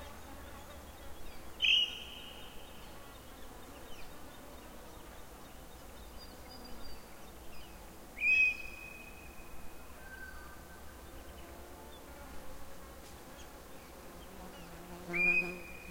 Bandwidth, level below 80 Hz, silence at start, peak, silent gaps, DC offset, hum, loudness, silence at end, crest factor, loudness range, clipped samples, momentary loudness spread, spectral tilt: 16.5 kHz; -56 dBFS; 0 s; -18 dBFS; none; under 0.1%; none; -31 LUFS; 0 s; 22 dB; 17 LU; under 0.1%; 23 LU; -2 dB/octave